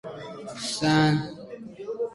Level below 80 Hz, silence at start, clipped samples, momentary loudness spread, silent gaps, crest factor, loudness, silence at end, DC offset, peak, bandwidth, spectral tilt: -58 dBFS; 0.05 s; under 0.1%; 18 LU; none; 20 dB; -25 LUFS; 0 s; under 0.1%; -8 dBFS; 11.5 kHz; -5 dB/octave